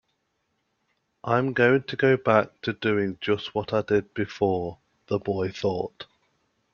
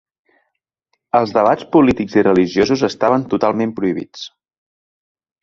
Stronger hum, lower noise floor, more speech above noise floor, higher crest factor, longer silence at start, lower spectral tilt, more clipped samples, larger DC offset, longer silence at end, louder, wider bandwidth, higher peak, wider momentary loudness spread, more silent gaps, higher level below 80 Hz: neither; about the same, -75 dBFS vs -74 dBFS; second, 50 dB vs 59 dB; first, 22 dB vs 16 dB; about the same, 1.25 s vs 1.15 s; about the same, -7 dB/octave vs -6.5 dB/octave; neither; neither; second, 0.7 s vs 1.15 s; second, -25 LUFS vs -16 LUFS; about the same, 7 kHz vs 7.4 kHz; second, -4 dBFS vs 0 dBFS; about the same, 11 LU vs 10 LU; neither; second, -62 dBFS vs -48 dBFS